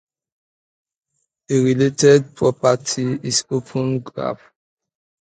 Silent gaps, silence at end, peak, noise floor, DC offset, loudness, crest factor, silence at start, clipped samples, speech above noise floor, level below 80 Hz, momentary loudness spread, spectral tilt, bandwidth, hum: none; 0.85 s; -2 dBFS; -74 dBFS; under 0.1%; -18 LUFS; 20 dB; 1.5 s; under 0.1%; 56 dB; -60 dBFS; 13 LU; -5 dB/octave; 9.4 kHz; none